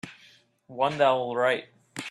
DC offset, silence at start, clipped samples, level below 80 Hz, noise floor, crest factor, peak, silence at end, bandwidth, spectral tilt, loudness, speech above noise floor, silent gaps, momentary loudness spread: under 0.1%; 0.05 s; under 0.1%; -72 dBFS; -58 dBFS; 20 dB; -8 dBFS; 0 s; 12.5 kHz; -4.5 dB/octave; -25 LUFS; 33 dB; none; 20 LU